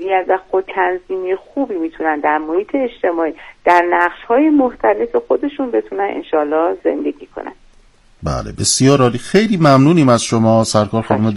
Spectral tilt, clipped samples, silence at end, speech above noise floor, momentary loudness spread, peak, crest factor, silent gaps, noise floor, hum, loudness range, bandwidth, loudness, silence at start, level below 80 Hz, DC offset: -5.5 dB/octave; 0.2%; 0 s; 33 dB; 11 LU; 0 dBFS; 16 dB; none; -48 dBFS; none; 6 LU; 12 kHz; -15 LUFS; 0 s; -44 dBFS; under 0.1%